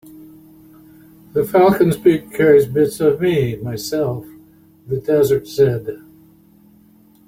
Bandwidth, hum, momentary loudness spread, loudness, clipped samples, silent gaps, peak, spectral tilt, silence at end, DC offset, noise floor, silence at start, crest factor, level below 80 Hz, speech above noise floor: 16.5 kHz; none; 13 LU; -16 LUFS; under 0.1%; none; -2 dBFS; -6.5 dB/octave; 1.3 s; under 0.1%; -50 dBFS; 0.15 s; 16 dB; -52 dBFS; 34 dB